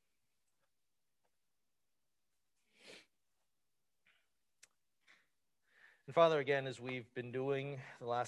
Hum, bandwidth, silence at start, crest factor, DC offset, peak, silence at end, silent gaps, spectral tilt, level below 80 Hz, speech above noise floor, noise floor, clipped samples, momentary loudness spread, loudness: none; 11.5 kHz; 2.85 s; 26 dB; under 0.1%; -16 dBFS; 0 s; none; -6 dB/octave; -88 dBFS; over 53 dB; under -90 dBFS; under 0.1%; 24 LU; -37 LUFS